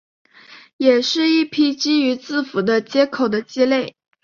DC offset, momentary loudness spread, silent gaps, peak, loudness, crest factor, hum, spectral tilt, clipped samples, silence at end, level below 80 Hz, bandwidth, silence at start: under 0.1%; 5 LU; 0.73-0.79 s; -2 dBFS; -18 LUFS; 16 dB; none; -4 dB/octave; under 0.1%; 0.35 s; -64 dBFS; 7.2 kHz; 0.5 s